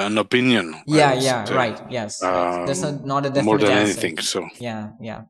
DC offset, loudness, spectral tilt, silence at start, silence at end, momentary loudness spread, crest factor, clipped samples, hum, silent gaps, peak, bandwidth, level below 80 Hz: under 0.1%; -20 LUFS; -4.5 dB/octave; 0 s; 0.05 s; 12 LU; 18 dB; under 0.1%; none; none; -2 dBFS; 13.5 kHz; -62 dBFS